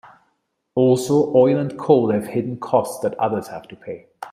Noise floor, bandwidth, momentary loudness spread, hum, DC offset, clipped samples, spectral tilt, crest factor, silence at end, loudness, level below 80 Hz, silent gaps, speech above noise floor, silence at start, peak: -70 dBFS; 15.5 kHz; 19 LU; none; under 0.1%; under 0.1%; -7 dB/octave; 18 dB; 0 s; -19 LUFS; -62 dBFS; none; 52 dB; 0.75 s; -2 dBFS